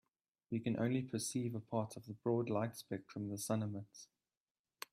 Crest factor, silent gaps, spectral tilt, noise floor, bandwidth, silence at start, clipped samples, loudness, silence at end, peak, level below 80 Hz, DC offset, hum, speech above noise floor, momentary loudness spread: 18 dB; none; -6 dB/octave; under -90 dBFS; 15.5 kHz; 0.5 s; under 0.1%; -41 LUFS; 0.9 s; -22 dBFS; -78 dBFS; under 0.1%; none; over 50 dB; 11 LU